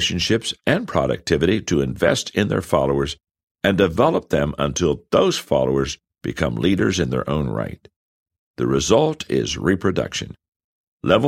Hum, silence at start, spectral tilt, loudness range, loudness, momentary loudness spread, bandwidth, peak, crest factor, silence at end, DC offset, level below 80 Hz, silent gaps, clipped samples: none; 0 s; -5 dB/octave; 2 LU; -20 LUFS; 9 LU; 16 kHz; 0 dBFS; 20 dB; 0 s; under 0.1%; -40 dBFS; 3.43-3.55 s, 7.96-8.26 s, 8.39-8.54 s, 10.48-10.97 s; under 0.1%